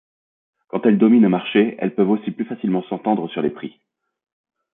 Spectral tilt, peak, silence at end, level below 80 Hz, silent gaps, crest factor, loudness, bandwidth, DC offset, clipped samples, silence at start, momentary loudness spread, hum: -12 dB/octave; -4 dBFS; 1.05 s; -66 dBFS; none; 16 dB; -19 LUFS; 3.8 kHz; under 0.1%; under 0.1%; 0.75 s; 13 LU; none